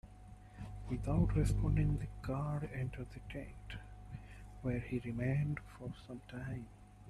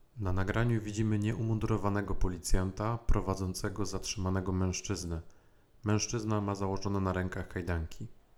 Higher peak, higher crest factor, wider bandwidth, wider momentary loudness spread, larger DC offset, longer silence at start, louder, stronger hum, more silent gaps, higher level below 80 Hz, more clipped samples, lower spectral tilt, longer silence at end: second, -20 dBFS vs -12 dBFS; about the same, 18 dB vs 20 dB; about the same, 12.5 kHz vs 13 kHz; first, 18 LU vs 6 LU; neither; about the same, 0.05 s vs 0.15 s; second, -39 LUFS vs -34 LUFS; first, 50 Hz at -50 dBFS vs none; neither; second, -46 dBFS vs -40 dBFS; neither; first, -8 dB/octave vs -5.5 dB/octave; second, 0 s vs 0.25 s